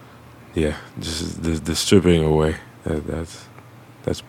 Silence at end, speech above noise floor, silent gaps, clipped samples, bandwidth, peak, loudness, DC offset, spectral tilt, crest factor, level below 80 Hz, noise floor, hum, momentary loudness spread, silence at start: 0.05 s; 24 dB; none; under 0.1%; 16.5 kHz; -2 dBFS; -22 LUFS; under 0.1%; -5.5 dB/octave; 20 dB; -36 dBFS; -44 dBFS; none; 15 LU; 0 s